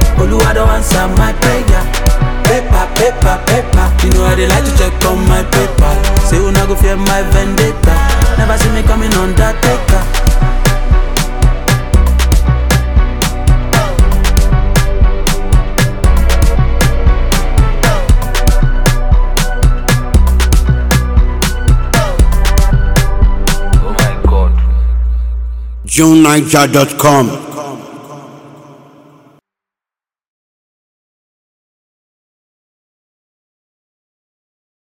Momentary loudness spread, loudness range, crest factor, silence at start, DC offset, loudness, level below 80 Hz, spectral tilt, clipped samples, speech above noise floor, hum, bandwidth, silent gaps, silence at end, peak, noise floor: 4 LU; 2 LU; 10 dB; 0 s; 0.6%; -11 LUFS; -12 dBFS; -5 dB/octave; 0.2%; over 81 dB; none; 19 kHz; none; 6.65 s; 0 dBFS; under -90 dBFS